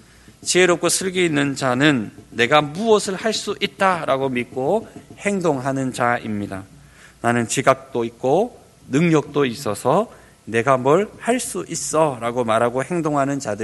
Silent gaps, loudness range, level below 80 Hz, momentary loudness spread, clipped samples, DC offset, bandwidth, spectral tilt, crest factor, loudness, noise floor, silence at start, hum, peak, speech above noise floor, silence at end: none; 4 LU; -56 dBFS; 8 LU; under 0.1%; under 0.1%; 12 kHz; -4.5 dB/octave; 20 dB; -20 LUFS; -46 dBFS; 0.4 s; none; 0 dBFS; 27 dB; 0 s